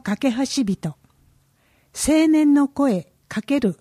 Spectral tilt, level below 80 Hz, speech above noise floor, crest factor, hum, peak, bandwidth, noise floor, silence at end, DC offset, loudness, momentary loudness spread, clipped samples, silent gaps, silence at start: -5 dB/octave; -50 dBFS; 42 dB; 14 dB; none; -6 dBFS; 14.5 kHz; -61 dBFS; 0.05 s; under 0.1%; -20 LUFS; 15 LU; under 0.1%; none; 0.05 s